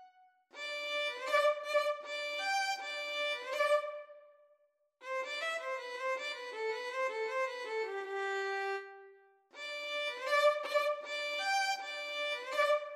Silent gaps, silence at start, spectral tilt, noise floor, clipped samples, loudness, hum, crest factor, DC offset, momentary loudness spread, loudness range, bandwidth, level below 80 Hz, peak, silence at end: none; 0 s; 2 dB/octave; -72 dBFS; under 0.1%; -35 LUFS; none; 18 dB; under 0.1%; 10 LU; 5 LU; 14 kHz; under -90 dBFS; -18 dBFS; 0 s